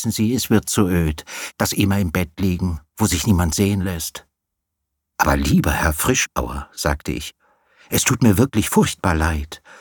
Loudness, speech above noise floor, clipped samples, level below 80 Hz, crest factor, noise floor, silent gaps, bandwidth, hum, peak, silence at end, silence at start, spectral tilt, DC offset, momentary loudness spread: -19 LUFS; 60 dB; under 0.1%; -32 dBFS; 18 dB; -79 dBFS; none; 19 kHz; none; -2 dBFS; 0.25 s; 0 s; -4.5 dB/octave; under 0.1%; 12 LU